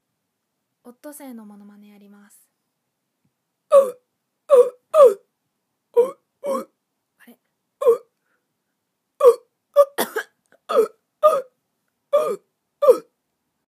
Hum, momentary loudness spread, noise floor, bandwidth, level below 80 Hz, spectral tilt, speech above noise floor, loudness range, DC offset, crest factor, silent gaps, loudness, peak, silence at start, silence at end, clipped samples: none; 18 LU; -77 dBFS; 15.5 kHz; -84 dBFS; -3 dB/octave; 35 dB; 7 LU; under 0.1%; 20 dB; none; -19 LUFS; -2 dBFS; 1.05 s; 0.7 s; under 0.1%